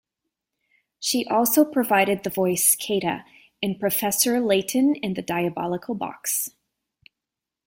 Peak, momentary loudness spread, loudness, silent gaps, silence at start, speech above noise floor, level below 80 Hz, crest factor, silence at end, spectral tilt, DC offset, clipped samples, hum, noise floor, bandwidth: -6 dBFS; 10 LU; -22 LUFS; none; 1 s; 64 dB; -64 dBFS; 20 dB; 1.2 s; -3.5 dB/octave; under 0.1%; under 0.1%; none; -87 dBFS; 16.5 kHz